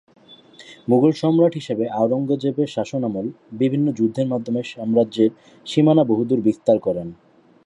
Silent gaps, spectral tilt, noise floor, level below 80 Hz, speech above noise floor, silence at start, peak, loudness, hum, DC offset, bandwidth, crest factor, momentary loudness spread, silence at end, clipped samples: none; -8 dB/octave; -47 dBFS; -62 dBFS; 27 dB; 0.3 s; -4 dBFS; -20 LUFS; none; under 0.1%; 10.5 kHz; 16 dB; 9 LU; 0.5 s; under 0.1%